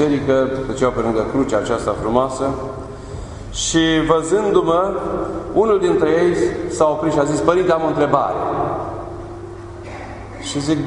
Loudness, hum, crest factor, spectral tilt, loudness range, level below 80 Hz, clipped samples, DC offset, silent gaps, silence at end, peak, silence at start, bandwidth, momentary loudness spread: -18 LUFS; none; 18 dB; -5 dB/octave; 4 LU; -38 dBFS; under 0.1%; under 0.1%; none; 0 s; 0 dBFS; 0 s; 11 kHz; 16 LU